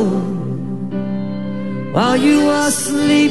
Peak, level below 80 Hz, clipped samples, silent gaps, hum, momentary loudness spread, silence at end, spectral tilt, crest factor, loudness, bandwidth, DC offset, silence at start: -2 dBFS; -48 dBFS; under 0.1%; none; none; 11 LU; 0 s; -4.5 dB/octave; 14 dB; -17 LUFS; 12.5 kHz; 2%; 0 s